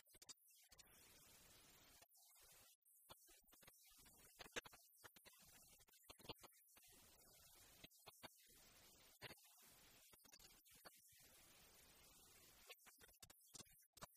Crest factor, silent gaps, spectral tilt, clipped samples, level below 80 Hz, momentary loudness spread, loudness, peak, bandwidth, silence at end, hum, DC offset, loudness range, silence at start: 30 dB; 2.75-2.82 s, 13.86-13.93 s; -1.5 dB/octave; under 0.1%; -84 dBFS; 7 LU; -65 LUFS; -36 dBFS; 15 kHz; 0 s; none; under 0.1%; 6 LU; 0.05 s